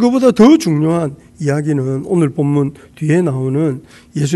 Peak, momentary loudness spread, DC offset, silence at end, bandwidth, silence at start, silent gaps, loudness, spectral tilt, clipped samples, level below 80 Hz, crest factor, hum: 0 dBFS; 13 LU; under 0.1%; 0 s; 12.5 kHz; 0 s; none; -14 LUFS; -7.5 dB/octave; 0.3%; -50 dBFS; 14 dB; none